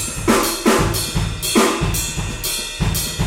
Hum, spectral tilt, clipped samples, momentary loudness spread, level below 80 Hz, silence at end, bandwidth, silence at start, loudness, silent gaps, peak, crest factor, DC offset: none; -3.5 dB/octave; under 0.1%; 6 LU; -30 dBFS; 0 s; 17 kHz; 0 s; -18 LUFS; none; -2 dBFS; 18 dB; under 0.1%